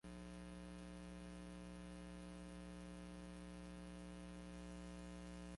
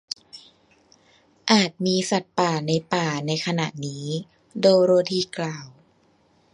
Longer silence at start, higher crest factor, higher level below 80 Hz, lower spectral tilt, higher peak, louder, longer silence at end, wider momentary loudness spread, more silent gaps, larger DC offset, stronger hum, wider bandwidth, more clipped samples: second, 0.05 s vs 0.35 s; second, 10 dB vs 22 dB; first, -62 dBFS vs -68 dBFS; about the same, -6 dB/octave vs -5 dB/octave; second, -44 dBFS vs -2 dBFS; second, -55 LUFS vs -23 LUFS; second, 0 s vs 0.85 s; second, 1 LU vs 14 LU; neither; neither; first, 60 Hz at -55 dBFS vs none; about the same, 11.5 kHz vs 11 kHz; neither